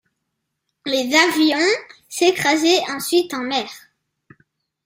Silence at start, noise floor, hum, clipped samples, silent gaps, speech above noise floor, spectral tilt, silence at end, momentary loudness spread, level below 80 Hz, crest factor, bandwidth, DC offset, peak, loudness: 0.85 s; -76 dBFS; none; under 0.1%; none; 58 dB; -2 dB/octave; 1.1 s; 9 LU; -66 dBFS; 18 dB; 16 kHz; under 0.1%; -2 dBFS; -18 LUFS